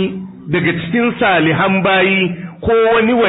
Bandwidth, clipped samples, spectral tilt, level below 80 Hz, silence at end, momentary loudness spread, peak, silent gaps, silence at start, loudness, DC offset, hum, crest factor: 4 kHz; under 0.1%; -11.5 dB/octave; -44 dBFS; 0 s; 8 LU; -2 dBFS; none; 0 s; -14 LUFS; under 0.1%; none; 12 dB